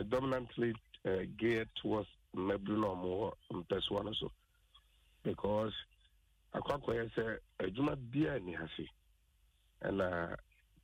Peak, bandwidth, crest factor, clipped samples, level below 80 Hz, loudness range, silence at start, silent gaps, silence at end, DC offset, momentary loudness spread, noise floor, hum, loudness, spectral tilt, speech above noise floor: -24 dBFS; 15 kHz; 16 dB; under 0.1%; -60 dBFS; 3 LU; 0 s; none; 0.4 s; under 0.1%; 10 LU; -72 dBFS; none; -39 LUFS; -7 dB/octave; 34 dB